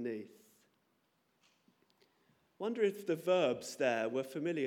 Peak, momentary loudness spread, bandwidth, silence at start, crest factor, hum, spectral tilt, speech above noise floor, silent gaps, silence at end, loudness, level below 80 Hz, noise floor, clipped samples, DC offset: -18 dBFS; 11 LU; 17 kHz; 0 s; 18 dB; none; -5 dB/octave; 42 dB; none; 0 s; -35 LUFS; -90 dBFS; -77 dBFS; under 0.1%; under 0.1%